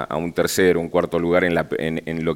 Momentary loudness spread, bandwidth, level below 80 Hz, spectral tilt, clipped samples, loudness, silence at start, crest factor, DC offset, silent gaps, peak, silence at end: 7 LU; 17.5 kHz; -48 dBFS; -5 dB/octave; under 0.1%; -20 LUFS; 0 s; 18 dB; under 0.1%; none; -2 dBFS; 0 s